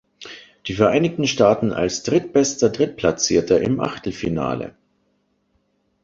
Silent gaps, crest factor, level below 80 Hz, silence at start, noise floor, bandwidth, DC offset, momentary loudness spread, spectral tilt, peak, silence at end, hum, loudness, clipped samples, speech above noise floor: none; 18 dB; -48 dBFS; 0.2 s; -67 dBFS; 7.8 kHz; under 0.1%; 14 LU; -4.5 dB/octave; -2 dBFS; 1.35 s; none; -19 LUFS; under 0.1%; 48 dB